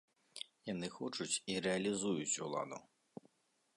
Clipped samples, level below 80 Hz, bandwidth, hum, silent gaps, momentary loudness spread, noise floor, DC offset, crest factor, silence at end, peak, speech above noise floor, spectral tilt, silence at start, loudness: under 0.1%; -78 dBFS; 11.5 kHz; none; none; 21 LU; -79 dBFS; under 0.1%; 18 dB; 0.95 s; -24 dBFS; 39 dB; -3.5 dB/octave; 0.35 s; -40 LUFS